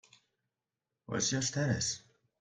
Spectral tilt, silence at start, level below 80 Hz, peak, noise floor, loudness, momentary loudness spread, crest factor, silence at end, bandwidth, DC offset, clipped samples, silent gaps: -3.5 dB/octave; 1.1 s; -66 dBFS; -18 dBFS; -90 dBFS; -33 LUFS; 8 LU; 20 dB; 0.4 s; 10.5 kHz; under 0.1%; under 0.1%; none